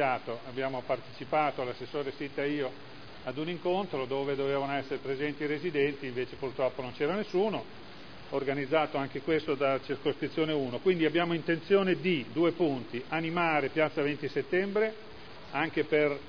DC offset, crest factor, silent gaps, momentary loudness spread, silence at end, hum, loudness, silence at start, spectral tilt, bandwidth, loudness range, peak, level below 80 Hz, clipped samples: 0.4%; 18 dB; none; 9 LU; 0 s; none; -31 LUFS; 0 s; -7.5 dB/octave; 5.4 kHz; 5 LU; -12 dBFS; -64 dBFS; under 0.1%